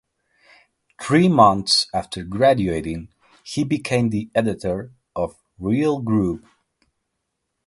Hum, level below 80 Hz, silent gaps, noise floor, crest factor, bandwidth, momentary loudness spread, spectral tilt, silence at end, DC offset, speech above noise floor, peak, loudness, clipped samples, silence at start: none; -48 dBFS; none; -77 dBFS; 20 dB; 11.5 kHz; 15 LU; -5.5 dB/octave; 1.3 s; under 0.1%; 57 dB; 0 dBFS; -20 LUFS; under 0.1%; 1 s